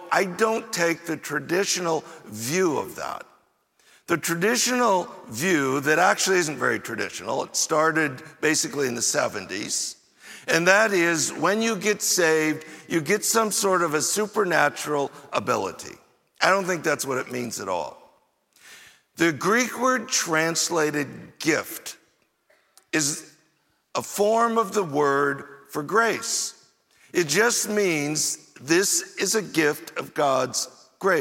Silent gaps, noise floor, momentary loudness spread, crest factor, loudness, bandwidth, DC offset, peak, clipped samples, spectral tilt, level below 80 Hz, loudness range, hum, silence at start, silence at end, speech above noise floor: none; -68 dBFS; 12 LU; 22 dB; -23 LUFS; 17 kHz; under 0.1%; -4 dBFS; under 0.1%; -2.5 dB/octave; -72 dBFS; 5 LU; none; 0 s; 0 s; 44 dB